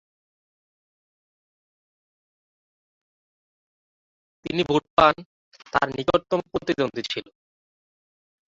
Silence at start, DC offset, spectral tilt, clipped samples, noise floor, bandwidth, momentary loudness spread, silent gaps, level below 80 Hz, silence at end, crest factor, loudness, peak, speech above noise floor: 4.45 s; under 0.1%; -5.5 dB/octave; under 0.1%; under -90 dBFS; 7.8 kHz; 12 LU; 4.90-4.97 s, 5.26-5.52 s; -56 dBFS; 1.25 s; 26 dB; -23 LUFS; -2 dBFS; over 67 dB